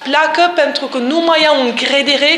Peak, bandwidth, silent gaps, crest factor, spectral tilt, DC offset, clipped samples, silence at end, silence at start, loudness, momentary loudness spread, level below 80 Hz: 0 dBFS; 11.5 kHz; none; 12 dB; -2 dB/octave; under 0.1%; under 0.1%; 0 s; 0 s; -12 LUFS; 5 LU; -68 dBFS